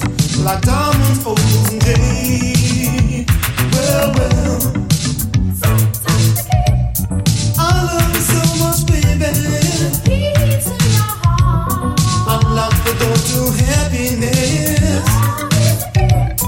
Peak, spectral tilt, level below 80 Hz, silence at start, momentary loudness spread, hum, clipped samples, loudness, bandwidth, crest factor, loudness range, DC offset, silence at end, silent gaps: 0 dBFS; -5 dB/octave; -24 dBFS; 0 s; 3 LU; none; under 0.1%; -14 LUFS; 17 kHz; 12 dB; 1 LU; under 0.1%; 0 s; none